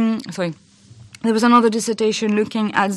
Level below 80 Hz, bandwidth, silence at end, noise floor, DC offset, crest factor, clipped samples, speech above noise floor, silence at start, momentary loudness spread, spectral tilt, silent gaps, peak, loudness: -64 dBFS; 12.5 kHz; 0 s; -45 dBFS; under 0.1%; 16 dB; under 0.1%; 28 dB; 0 s; 12 LU; -4.5 dB/octave; none; -2 dBFS; -18 LUFS